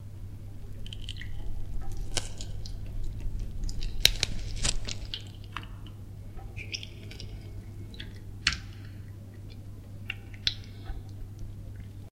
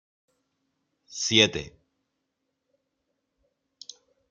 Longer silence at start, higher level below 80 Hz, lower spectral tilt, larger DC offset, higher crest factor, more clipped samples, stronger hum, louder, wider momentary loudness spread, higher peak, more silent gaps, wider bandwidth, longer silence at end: second, 0 s vs 1.1 s; first, -38 dBFS vs -62 dBFS; about the same, -2.5 dB/octave vs -2.5 dB/octave; neither; first, 34 dB vs 28 dB; neither; neither; second, -35 LUFS vs -22 LUFS; second, 15 LU vs 25 LU; first, 0 dBFS vs -4 dBFS; neither; first, 16 kHz vs 13 kHz; second, 0 s vs 2.6 s